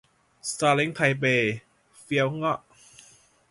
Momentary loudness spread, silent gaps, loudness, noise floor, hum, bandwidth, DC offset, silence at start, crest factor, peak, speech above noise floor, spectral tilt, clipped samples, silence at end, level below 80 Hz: 11 LU; none; -25 LUFS; -57 dBFS; none; 11.5 kHz; under 0.1%; 0.45 s; 20 dB; -8 dBFS; 32 dB; -4.5 dB/octave; under 0.1%; 0.95 s; -66 dBFS